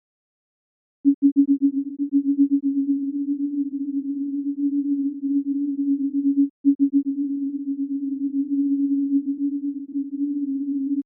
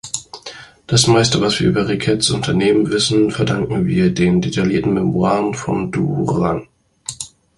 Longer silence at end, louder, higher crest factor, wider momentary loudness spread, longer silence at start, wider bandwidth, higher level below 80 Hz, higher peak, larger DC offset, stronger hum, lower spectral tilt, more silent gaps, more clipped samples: second, 0.05 s vs 0.3 s; second, -23 LUFS vs -16 LUFS; about the same, 14 dB vs 16 dB; second, 7 LU vs 14 LU; first, 1.05 s vs 0.05 s; second, 0.5 kHz vs 11.5 kHz; second, -80 dBFS vs -42 dBFS; second, -8 dBFS vs 0 dBFS; neither; neither; first, -16.5 dB/octave vs -5 dB/octave; first, 1.14-1.22 s, 1.32-1.36 s, 6.50-6.64 s, 6.75-6.79 s vs none; neither